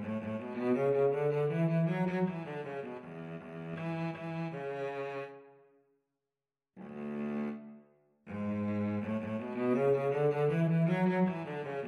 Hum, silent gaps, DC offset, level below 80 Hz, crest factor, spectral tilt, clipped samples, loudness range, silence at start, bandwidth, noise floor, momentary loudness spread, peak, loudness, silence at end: none; none; under 0.1%; -76 dBFS; 14 dB; -9.5 dB/octave; under 0.1%; 11 LU; 0 s; 6.4 kHz; under -90 dBFS; 15 LU; -20 dBFS; -34 LUFS; 0 s